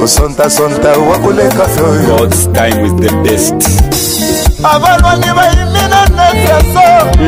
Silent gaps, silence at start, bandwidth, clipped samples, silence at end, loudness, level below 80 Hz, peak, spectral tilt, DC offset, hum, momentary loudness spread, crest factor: none; 0 s; 16.5 kHz; 1%; 0 s; -8 LUFS; -16 dBFS; 0 dBFS; -4.5 dB/octave; under 0.1%; none; 4 LU; 8 dB